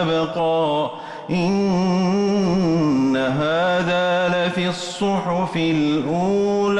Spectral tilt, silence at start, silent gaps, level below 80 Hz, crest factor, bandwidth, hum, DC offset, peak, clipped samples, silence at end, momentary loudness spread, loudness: -6.5 dB/octave; 0 s; none; -52 dBFS; 8 dB; 11 kHz; none; under 0.1%; -10 dBFS; under 0.1%; 0 s; 4 LU; -20 LUFS